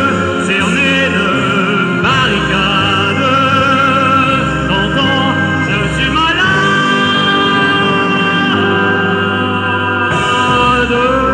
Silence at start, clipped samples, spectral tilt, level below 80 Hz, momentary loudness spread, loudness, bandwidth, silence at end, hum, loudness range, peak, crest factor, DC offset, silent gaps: 0 s; under 0.1%; -5 dB/octave; -34 dBFS; 3 LU; -11 LUFS; 11 kHz; 0 s; none; 1 LU; 0 dBFS; 12 dB; under 0.1%; none